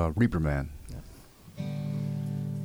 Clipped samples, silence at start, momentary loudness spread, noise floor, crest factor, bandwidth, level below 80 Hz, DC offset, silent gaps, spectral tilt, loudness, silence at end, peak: under 0.1%; 0 s; 22 LU; -50 dBFS; 18 dB; over 20 kHz; -42 dBFS; under 0.1%; none; -8.5 dB/octave; -31 LUFS; 0 s; -12 dBFS